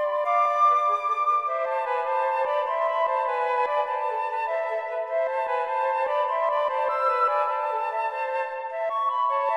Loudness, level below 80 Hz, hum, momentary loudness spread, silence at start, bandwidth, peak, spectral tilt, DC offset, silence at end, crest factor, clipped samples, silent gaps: -25 LUFS; -78 dBFS; none; 5 LU; 0 s; 11.5 kHz; -12 dBFS; -1 dB/octave; under 0.1%; 0 s; 14 dB; under 0.1%; none